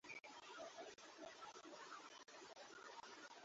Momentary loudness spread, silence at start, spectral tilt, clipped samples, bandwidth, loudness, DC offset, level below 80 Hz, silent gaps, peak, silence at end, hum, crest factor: 3 LU; 0.05 s; 0 dB/octave; under 0.1%; 7.6 kHz; -58 LUFS; under 0.1%; under -90 dBFS; none; -44 dBFS; 0 s; none; 14 dB